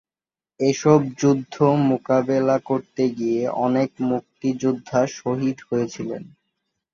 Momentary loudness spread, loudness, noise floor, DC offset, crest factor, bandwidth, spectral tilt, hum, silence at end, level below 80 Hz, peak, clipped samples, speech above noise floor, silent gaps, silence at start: 8 LU; -21 LUFS; under -90 dBFS; under 0.1%; 18 dB; 7.4 kHz; -7 dB/octave; none; 0.65 s; -62 dBFS; -2 dBFS; under 0.1%; over 69 dB; none; 0.6 s